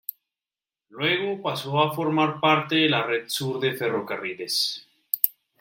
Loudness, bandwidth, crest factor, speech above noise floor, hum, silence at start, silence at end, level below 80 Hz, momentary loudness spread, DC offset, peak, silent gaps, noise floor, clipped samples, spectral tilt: -24 LUFS; 16.5 kHz; 26 dB; over 66 dB; none; 0.95 s; 0.3 s; -72 dBFS; 9 LU; under 0.1%; 0 dBFS; none; under -90 dBFS; under 0.1%; -4 dB/octave